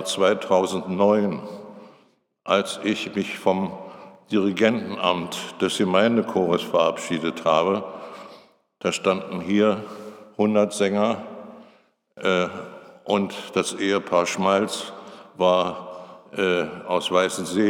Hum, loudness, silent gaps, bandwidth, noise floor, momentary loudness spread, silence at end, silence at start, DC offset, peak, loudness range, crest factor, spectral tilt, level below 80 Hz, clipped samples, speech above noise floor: none; -23 LUFS; none; 16.5 kHz; -61 dBFS; 19 LU; 0 s; 0 s; under 0.1%; -2 dBFS; 3 LU; 20 dB; -4.5 dB/octave; -68 dBFS; under 0.1%; 39 dB